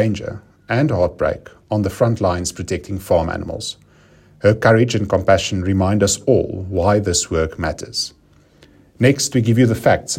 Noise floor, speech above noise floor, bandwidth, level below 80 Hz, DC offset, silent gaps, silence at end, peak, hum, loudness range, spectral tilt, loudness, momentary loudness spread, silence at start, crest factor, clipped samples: -50 dBFS; 33 dB; 16 kHz; -42 dBFS; under 0.1%; none; 0 s; 0 dBFS; none; 4 LU; -5 dB/octave; -18 LUFS; 11 LU; 0 s; 18 dB; under 0.1%